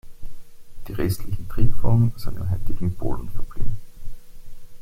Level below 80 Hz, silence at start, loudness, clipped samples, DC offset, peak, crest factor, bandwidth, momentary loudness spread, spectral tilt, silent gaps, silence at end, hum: -30 dBFS; 0.05 s; -27 LUFS; under 0.1%; under 0.1%; -4 dBFS; 14 dB; 15 kHz; 25 LU; -8 dB/octave; none; 0 s; none